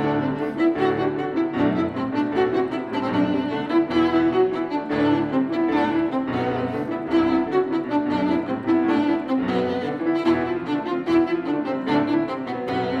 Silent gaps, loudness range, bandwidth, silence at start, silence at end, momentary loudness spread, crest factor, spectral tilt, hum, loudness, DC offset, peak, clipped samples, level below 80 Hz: none; 1 LU; 6.4 kHz; 0 s; 0 s; 5 LU; 14 dB; -7.5 dB/octave; none; -22 LUFS; under 0.1%; -8 dBFS; under 0.1%; -56 dBFS